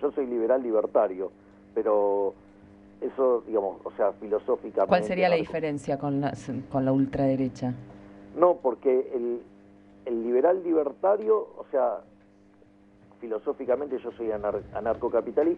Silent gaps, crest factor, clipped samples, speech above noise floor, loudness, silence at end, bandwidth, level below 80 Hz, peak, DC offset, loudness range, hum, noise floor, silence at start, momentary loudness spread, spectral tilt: none; 20 dB; under 0.1%; 31 dB; -27 LUFS; 0 s; 10 kHz; -60 dBFS; -6 dBFS; under 0.1%; 4 LU; none; -57 dBFS; 0 s; 11 LU; -8 dB/octave